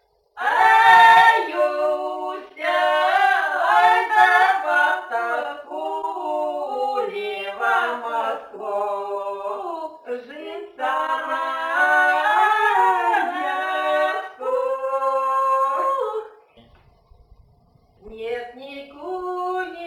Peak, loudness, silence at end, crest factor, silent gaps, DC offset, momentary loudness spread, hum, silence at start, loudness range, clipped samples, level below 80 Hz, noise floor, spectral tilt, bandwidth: -2 dBFS; -19 LUFS; 0 s; 18 dB; none; under 0.1%; 15 LU; none; 0.35 s; 11 LU; under 0.1%; -64 dBFS; -57 dBFS; -2 dB/octave; 17 kHz